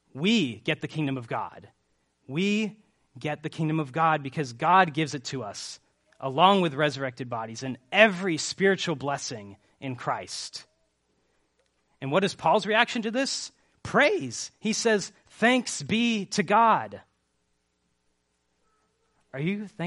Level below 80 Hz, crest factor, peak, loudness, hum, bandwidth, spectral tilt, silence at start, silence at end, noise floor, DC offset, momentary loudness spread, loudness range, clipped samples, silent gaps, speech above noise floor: -70 dBFS; 24 dB; -2 dBFS; -26 LUFS; none; 11.5 kHz; -4 dB/octave; 0.15 s; 0 s; -74 dBFS; under 0.1%; 16 LU; 7 LU; under 0.1%; none; 48 dB